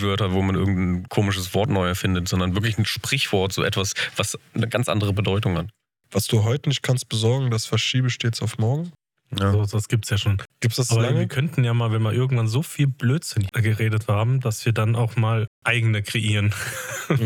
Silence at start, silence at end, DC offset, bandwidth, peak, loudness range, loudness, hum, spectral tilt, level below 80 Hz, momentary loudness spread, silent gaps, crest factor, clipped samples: 0 s; 0 s; under 0.1%; 17 kHz; -4 dBFS; 1 LU; -22 LUFS; none; -5 dB/octave; -56 dBFS; 4 LU; 15.47-15.62 s; 18 dB; under 0.1%